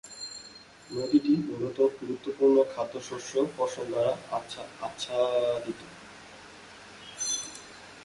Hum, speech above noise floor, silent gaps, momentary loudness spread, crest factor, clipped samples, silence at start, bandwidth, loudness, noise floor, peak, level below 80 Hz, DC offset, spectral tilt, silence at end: none; 22 dB; none; 23 LU; 18 dB; under 0.1%; 0.05 s; 11.5 kHz; -29 LUFS; -50 dBFS; -12 dBFS; -68 dBFS; under 0.1%; -4 dB/octave; 0 s